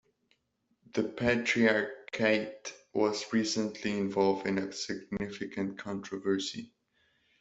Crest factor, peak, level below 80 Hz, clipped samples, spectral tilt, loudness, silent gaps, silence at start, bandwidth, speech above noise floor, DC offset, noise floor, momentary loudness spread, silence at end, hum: 20 dB; -12 dBFS; -66 dBFS; under 0.1%; -4.5 dB/octave; -31 LUFS; none; 0.95 s; 8.2 kHz; 46 dB; under 0.1%; -77 dBFS; 11 LU; 0.75 s; none